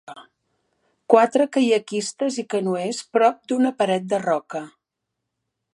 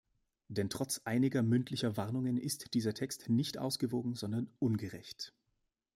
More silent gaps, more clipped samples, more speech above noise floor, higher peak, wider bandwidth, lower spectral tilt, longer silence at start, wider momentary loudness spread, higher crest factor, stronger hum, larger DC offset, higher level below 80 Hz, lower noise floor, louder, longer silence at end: neither; neither; first, 61 dB vs 48 dB; first, 0 dBFS vs -20 dBFS; second, 11.5 kHz vs 16 kHz; about the same, -4.5 dB/octave vs -5.5 dB/octave; second, 0.1 s vs 0.5 s; about the same, 9 LU vs 10 LU; first, 22 dB vs 16 dB; neither; neither; about the same, -76 dBFS vs -72 dBFS; about the same, -81 dBFS vs -83 dBFS; first, -21 LUFS vs -36 LUFS; first, 1.05 s vs 0.65 s